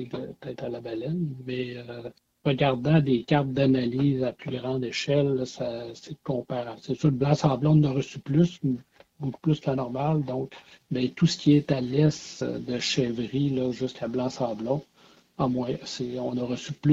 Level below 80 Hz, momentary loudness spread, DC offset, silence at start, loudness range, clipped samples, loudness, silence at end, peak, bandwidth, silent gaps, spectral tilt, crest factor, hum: -58 dBFS; 13 LU; under 0.1%; 0 s; 4 LU; under 0.1%; -27 LUFS; 0 s; -6 dBFS; 7.8 kHz; none; -7 dB/octave; 20 dB; none